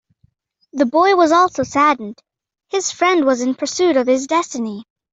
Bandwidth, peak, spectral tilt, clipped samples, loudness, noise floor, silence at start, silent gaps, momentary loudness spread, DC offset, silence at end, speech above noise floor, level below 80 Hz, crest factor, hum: 8 kHz; -2 dBFS; -3 dB/octave; under 0.1%; -16 LUFS; -60 dBFS; 0.75 s; none; 13 LU; under 0.1%; 0.3 s; 45 dB; -60 dBFS; 14 dB; none